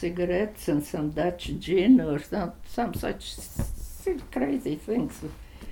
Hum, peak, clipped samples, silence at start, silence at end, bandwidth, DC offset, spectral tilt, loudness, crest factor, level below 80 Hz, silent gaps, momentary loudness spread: none; -8 dBFS; under 0.1%; 0 s; 0 s; 18.5 kHz; under 0.1%; -6 dB/octave; -28 LUFS; 18 dB; -42 dBFS; none; 14 LU